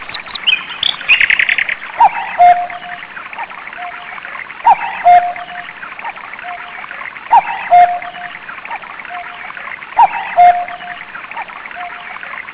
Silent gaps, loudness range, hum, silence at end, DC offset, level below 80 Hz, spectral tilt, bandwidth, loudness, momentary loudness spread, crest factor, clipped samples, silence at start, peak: none; 4 LU; none; 0 s; under 0.1%; -54 dBFS; -4.5 dB/octave; 4 kHz; -11 LUFS; 17 LU; 14 dB; under 0.1%; 0 s; 0 dBFS